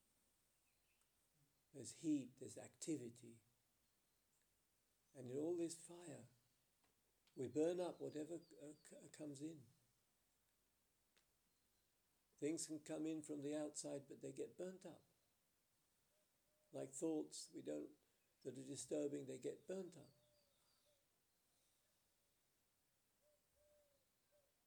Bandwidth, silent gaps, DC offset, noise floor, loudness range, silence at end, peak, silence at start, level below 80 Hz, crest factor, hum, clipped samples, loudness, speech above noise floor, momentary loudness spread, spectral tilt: over 20 kHz; none; under 0.1%; -85 dBFS; 8 LU; 4.55 s; -32 dBFS; 1.75 s; under -90 dBFS; 22 dB; none; under 0.1%; -50 LUFS; 35 dB; 16 LU; -5 dB/octave